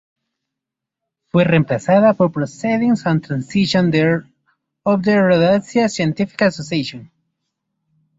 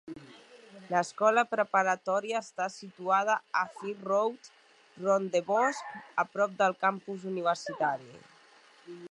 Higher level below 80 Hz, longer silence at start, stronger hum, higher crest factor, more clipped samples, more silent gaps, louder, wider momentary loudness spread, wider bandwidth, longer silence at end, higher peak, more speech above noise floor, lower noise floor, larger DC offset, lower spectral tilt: first, -54 dBFS vs -84 dBFS; first, 1.35 s vs 0.05 s; neither; about the same, 16 dB vs 20 dB; neither; neither; first, -17 LUFS vs -30 LUFS; second, 9 LU vs 12 LU; second, 8 kHz vs 11 kHz; first, 1.15 s vs 0 s; first, -2 dBFS vs -12 dBFS; first, 67 dB vs 29 dB; first, -83 dBFS vs -59 dBFS; neither; first, -6.5 dB/octave vs -4 dB/octave